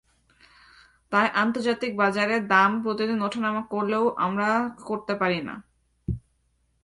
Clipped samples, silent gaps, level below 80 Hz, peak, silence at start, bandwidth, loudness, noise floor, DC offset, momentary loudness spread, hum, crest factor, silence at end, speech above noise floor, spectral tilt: under 0.1%; none; -52 dBFS; -6 dBFS; 1.1 s; 11.5 kHz; -24 LUFS; -69 dBFS; under 0.1%; 14 LU; none; 20 dB; 0.65 s; 45 dB; -6 dB/octave